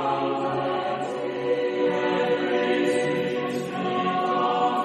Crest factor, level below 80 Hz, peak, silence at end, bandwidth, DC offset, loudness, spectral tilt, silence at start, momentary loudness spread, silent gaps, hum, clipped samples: 14 dB; -68 dBFS; -10 dBFS; 0 s; 12 kHz; under 0.1%; -25 LUFS; -5.5 dB/octave; 0 s; 5 LU; none; none; under 0.1%